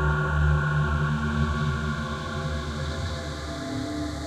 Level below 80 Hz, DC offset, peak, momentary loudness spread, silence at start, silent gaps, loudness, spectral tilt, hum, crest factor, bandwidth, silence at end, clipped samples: -32 dBFS; under 0.1%; -12 dBFS; 8 LU; 0 s; none; -27 LUFS; -6.5 dB/octave; none; 14 dB; 11 kHz; 0 s; under 0.1%